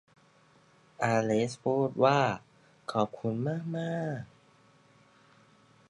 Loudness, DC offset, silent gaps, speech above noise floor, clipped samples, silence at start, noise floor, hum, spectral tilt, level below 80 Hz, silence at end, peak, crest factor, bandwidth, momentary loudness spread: -30 LUFS; under 0.1%; none; 34 dB; under 0.1%; 1 s; -63 dBFS; none; -6.5 dB/octave; -72 dBFS; 1.65 s; -10 dBFS; 22 dB; 11.5 kHz; 14 LU